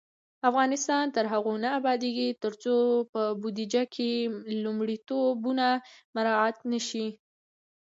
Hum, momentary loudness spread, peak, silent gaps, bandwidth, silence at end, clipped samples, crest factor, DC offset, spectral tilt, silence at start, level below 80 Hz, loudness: none; 7 LU; -10 dBFS; 3.09-3.13 s, 6.05-6.13 s; 8 kHz; 0.8 s; under 0.1%; 18 dB; under 0.1%; -3.5 dB/octave; 0.45 s; -82 dBFS; -28 LUFS